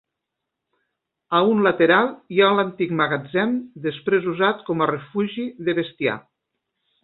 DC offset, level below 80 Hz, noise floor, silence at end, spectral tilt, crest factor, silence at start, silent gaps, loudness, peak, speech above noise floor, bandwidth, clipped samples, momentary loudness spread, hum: under 0.1%; -66 dBFS; -82 dBFS; 0.85 s; -10.5 dB/octave; 20 dB; 1.3 s; none; -21 LUFS; -2 dBFS; 61 dB; 4.2 kHz; under 0.1%; 9 LU; none